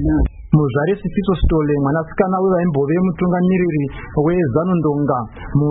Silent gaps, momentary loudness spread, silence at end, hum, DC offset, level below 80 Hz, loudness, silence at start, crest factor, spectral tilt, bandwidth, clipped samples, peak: none; 4 LU; 0 s; none; under 0.1%; -28 dBFS; -17 LUFS; 0 s; 16 dB; -14 dB/octave; 4 kHz; under 0.1%; -2 dBFS